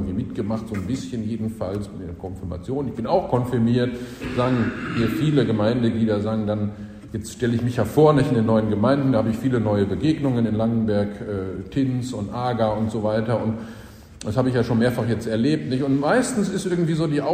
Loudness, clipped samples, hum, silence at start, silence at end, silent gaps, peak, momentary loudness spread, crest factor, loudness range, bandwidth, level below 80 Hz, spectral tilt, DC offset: -22 LUFS; under 0.1%; none; 0 s; 0 s; none; -4 dBFS; 10 LU; 18 dB; 5 LU; 15 kHz; -46 dBFS; -7 dB/octave; under 0.1%